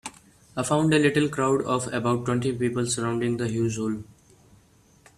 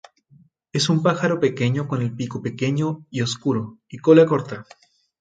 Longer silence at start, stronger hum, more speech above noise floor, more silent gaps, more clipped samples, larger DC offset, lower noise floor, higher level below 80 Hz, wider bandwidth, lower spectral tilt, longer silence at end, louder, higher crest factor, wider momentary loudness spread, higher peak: second, 0.05 s vs 0.75 s; neither; about the same, 34 dB vs 35 dB; neither; neither; neither; about the same, -58 dBFS vs -55 dBFS; about the same, -58 dBFS vs -62 dBFS; first, 14 kHz vs 9.2 kHz; about the same, -5.5 dB/octave vs -6 dB/octave; first, 1.15 s vs 0.6 s; second, -25 LUFS vs -21 LUFS; about the same, 18 dB vs 20 dB; second, 10 LU vs 13 LU; second, -8 dBFS vs -2 dBFS